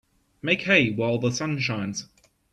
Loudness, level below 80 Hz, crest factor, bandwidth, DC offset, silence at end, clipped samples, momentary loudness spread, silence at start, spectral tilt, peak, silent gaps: -24 LUFS; -60 dBFS; 22 dB; 12 kHz; under 0.1%; 0.5 s; under 0.1%; 13 LU; 0.45 s; -4.5 dB/octave; -4 dBFS; none